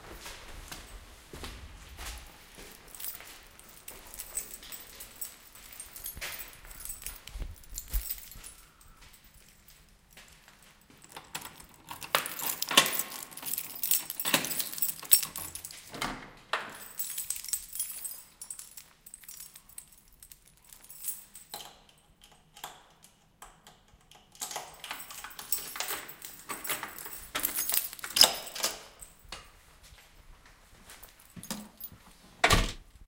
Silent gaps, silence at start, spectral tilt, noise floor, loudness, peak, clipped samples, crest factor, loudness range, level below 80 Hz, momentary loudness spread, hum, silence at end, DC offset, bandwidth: none; 0 s; -1 dB/octave; -61 dBFS; -31 LUFS; 0 dBFS; under 0.1%; 36 dB; 16 LU; -50 dBFS; 24 LU; none; 0 s; under 0.1%; 17 kHz